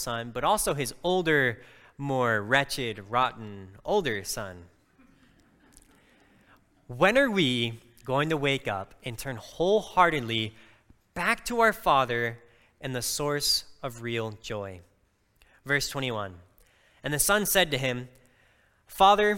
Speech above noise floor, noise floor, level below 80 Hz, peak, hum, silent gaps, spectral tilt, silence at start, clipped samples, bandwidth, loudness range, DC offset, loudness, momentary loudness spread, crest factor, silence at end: 41 dB; -68 dBFS; -54 dBFS; -6 dBFS; none; none; -3.5 dB/octave; 0 s; under 0.1%; 17 kHz; 6 LU; under 0.1%; -27 LUFS; 16 LU; 22 dB; 0 s